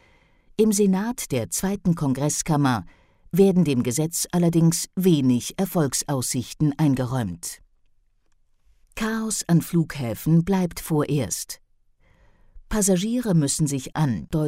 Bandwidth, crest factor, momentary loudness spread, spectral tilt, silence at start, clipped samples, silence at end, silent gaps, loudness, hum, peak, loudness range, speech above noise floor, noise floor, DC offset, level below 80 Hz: 16 kHz; 18 dB; 9 LU; -5.5 dB/octave; 0.6 s; under 0.1%; 0 s; none; -23 LUFS; none; -6 dBFS; 5 LU; 40 dB; -62 dBFS; under 0.1%; -46 dBFS